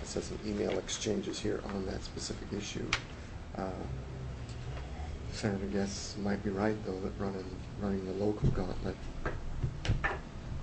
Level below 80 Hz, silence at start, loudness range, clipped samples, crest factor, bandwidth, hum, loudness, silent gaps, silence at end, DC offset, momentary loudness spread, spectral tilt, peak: -44 dBFS; 0 s; 4 LU; under 0.1%; 22 dB; 8.6 kHz; none; -37 LUFS; none; 0 s; under 0.1%; 9 LU; -5 dB/octave; -14 dBFS